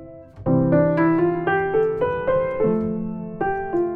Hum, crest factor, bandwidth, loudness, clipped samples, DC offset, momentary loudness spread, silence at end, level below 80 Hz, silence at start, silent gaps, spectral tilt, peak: none; 14 dB; 4.3 kHz; -21 LUFS; under 0.1%; under 0.1%; 8 LU; 0 s; -46 dBFS; 0 s; none; -11 dB/octave; -8 dBFS